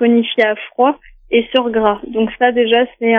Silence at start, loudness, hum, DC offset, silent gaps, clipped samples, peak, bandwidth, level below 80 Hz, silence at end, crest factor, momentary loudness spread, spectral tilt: 0 s; -15 LUFS; none; under 0.1%; none; under 0.1%; 0 dBFS; 4.8 kHz; -48 dBFS; 0 s; 14 dB; 5 LU; -7 dB/octave